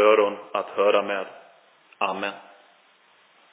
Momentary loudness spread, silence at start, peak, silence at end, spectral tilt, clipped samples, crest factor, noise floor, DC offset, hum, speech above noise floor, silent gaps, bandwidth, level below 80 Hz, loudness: 12 LU; 0 s; -6 dBFS; 1.1 s; -7.5 dB/octave; under 0.1%; 20 dB; -59 dBFS; under 0.1%; none; 34 dB; none; 4 kHz; -80 dBFS; -24 LUFS